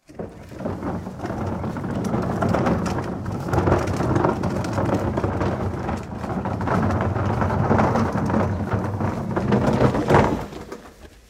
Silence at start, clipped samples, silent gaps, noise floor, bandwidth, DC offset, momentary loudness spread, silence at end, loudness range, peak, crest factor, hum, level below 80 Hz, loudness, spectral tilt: 0.1 s; under 0.1%; none; -44 dBFS; 15 kHz; under 0.1%; 11 LU; 0.2 s; 3 LU; -2 dBFS; 22 dB; none; -38 dBFS; -23 LUFS; -7.5 dB/octave